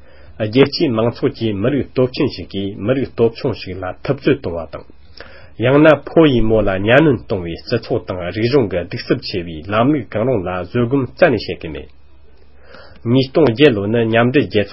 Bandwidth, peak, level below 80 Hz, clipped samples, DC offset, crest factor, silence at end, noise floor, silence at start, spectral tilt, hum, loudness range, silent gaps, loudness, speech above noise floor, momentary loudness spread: 5.8 kHz; 0 dBFS; -38 dBFS; under 0.1%; 1%; 16 dB; 0 s; -47 dBFS; 0.3 s; -9 dB/octave; none; 5 LU; none; -16 LUFS; 31 dB; 13 LU